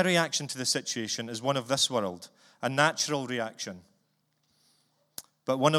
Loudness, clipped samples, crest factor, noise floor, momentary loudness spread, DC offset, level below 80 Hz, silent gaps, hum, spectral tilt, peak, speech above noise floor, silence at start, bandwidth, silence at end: -29 LUFS; under 0.1%; 24 dB; -74 dBFS; 20 LU; under 0.1%; -76 dBFS; none; none; -3 dB/octave; -8 dBFS; 45 dB; 0 s; 16.5 kHz; 0 s